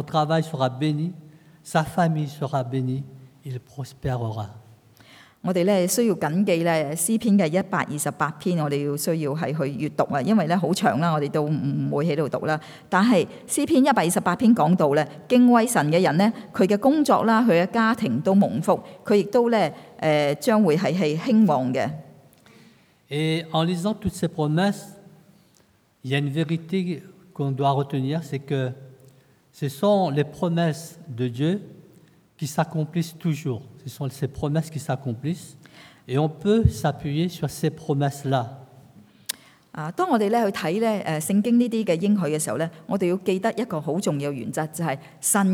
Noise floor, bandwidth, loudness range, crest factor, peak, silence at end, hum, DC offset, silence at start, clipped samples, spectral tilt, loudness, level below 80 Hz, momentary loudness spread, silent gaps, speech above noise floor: -60 dBFS; 18 kHz; 8 LU; 20 dB; -4 dBFS; 0 s; none; under 0.1%; 0 s; under 0.1%; -6 dB/octave; -23 LUFS; -52 dBFS; 12 LU; none; 38 dB